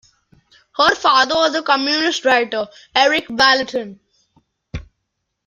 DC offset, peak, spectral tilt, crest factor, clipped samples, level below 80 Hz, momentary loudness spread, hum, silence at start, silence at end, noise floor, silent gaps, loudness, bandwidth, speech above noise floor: under 0.1%; 0 dBFS; -2.5 dB/octave; 18 dB; under 0.1%; -48 dBFS; 21 LU; none; 0.8 s; 0.65 s; -75 dBFS; none; -16 LUFS; 13.5 kHz; 59 dB